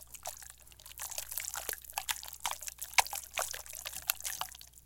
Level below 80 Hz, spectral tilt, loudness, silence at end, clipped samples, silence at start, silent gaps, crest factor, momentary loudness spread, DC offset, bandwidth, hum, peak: -62 dBFS; 1.5 dB/octave; -36 LUFS; 0 s; under 0.1%; 0 s; none; 36 dB; 14 LU; under 0.1%; 17 kHz; 60 Hz at -60 dBFS; -4 dBFS